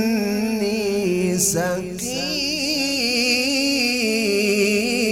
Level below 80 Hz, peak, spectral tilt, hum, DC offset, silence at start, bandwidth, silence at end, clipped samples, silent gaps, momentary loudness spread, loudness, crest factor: -52 dBFS; -4 dBFS; -3 dB/octave; none; under 0.1%; 0 s; 16.5 kHz; 0 s; under 0.1%; none; 5 LU; -19 LUFS; 16 dB